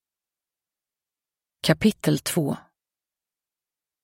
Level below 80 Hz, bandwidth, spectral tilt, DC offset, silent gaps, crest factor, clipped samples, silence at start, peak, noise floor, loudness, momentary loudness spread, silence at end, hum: -56 dBFS; 16 kHz; -5 dB/octave; under 0.1%; none; 24 dB; under 0.1%; 1.65 s; -4 dBFS; under -90 dBFS; -24 LUFS; 8 LU; 1.45 s; none